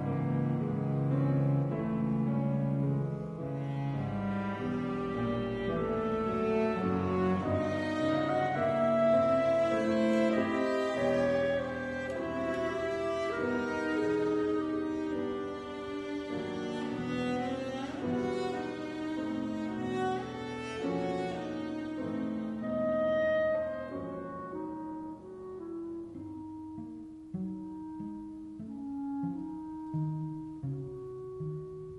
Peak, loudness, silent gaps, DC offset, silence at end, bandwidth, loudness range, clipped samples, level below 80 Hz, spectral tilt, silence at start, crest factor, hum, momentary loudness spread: -16 dBFS; -33 LUFS; none; under 0.1%; 0 s; 11 kHz; 12 LU; under 0.1%; -60 dBFS; -7.5 dB/octave; 0 s; 16 dB; none; 13 LU